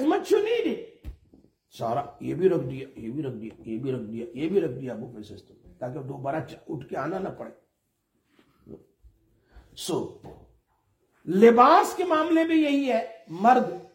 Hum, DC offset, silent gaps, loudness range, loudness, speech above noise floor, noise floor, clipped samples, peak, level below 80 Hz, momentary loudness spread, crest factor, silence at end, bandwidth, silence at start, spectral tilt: none; under 0.1%; none; 17 LU; -25 LUFS; 50 dB; -75 dBFS; under 0.1%; -4 dBFS; -58 dBFS; 20 LU; 22 dB; 0.1 s; 16.5 kHz; 0 s; -6 dB/octave